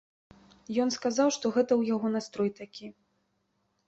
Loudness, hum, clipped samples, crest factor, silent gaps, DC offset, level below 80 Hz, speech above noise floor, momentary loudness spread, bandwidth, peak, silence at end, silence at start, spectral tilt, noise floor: -28 LUFS; none; under 0.1%; 18 dB; none; under 0.1%; -72 dBFS; 47 dB; 18 LU; 8.2 kHz; -14 dBFS; 0.95 s; 0.7 s; -4.5 dB/octave; -76 dBFS